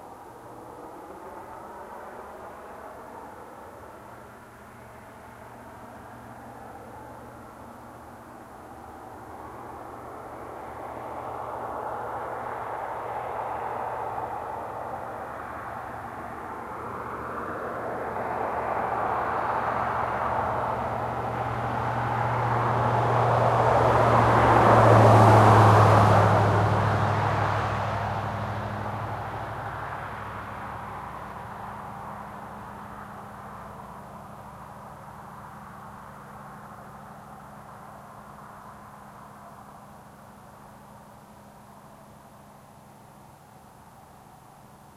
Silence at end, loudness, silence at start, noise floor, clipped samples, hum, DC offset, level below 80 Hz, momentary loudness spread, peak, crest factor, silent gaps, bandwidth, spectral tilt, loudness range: 0.2 s; -25 LUFS; 0 s; -50 dBFS; under 0.1%; none; under 0.1%; -50 dBFS; 25 LU; -4 dBFS; 24 dB; none; 14.5 kHz; -7 dB/octave; 26 LU